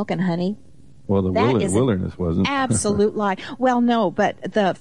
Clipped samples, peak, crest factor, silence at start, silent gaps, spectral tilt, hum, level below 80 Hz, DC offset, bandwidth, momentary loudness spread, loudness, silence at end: under 0.1%; -8 dBFS; 12 dB; 0 s; none; -5.5 dB/octave; none; -50 dBFS; 0.6%; 11.5 kHz; 6 LU; -21 LUFS; 0.05 s